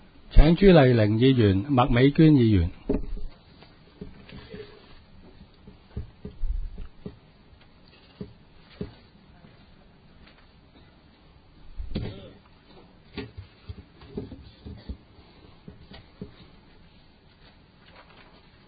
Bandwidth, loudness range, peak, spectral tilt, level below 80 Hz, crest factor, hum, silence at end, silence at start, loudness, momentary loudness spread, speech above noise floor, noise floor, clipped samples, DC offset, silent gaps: 5 kHz; 26 LU; -2 dBFS; -11.5 dB/octave; -34 dBFS; 24 dB; none; 2.4 s; 0.3 s; -21 LUFS; 28 LU; 36 dB; -55 dBFS; under 0.1%; under 0.1%; none